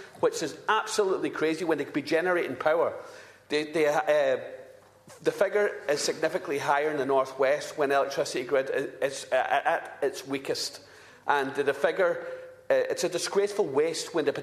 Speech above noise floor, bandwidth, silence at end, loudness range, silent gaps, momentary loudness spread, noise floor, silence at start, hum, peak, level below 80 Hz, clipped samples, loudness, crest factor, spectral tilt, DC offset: 23 dB; 14 kHz; 0 s; 2 LU; none; 7 LU; -51 dBFS; 0 s; none; -8 dBFS; -74 dBFS; under 0.1%; -28 LUFS; 20 dB; -3.5 dB/octave; under 0.1%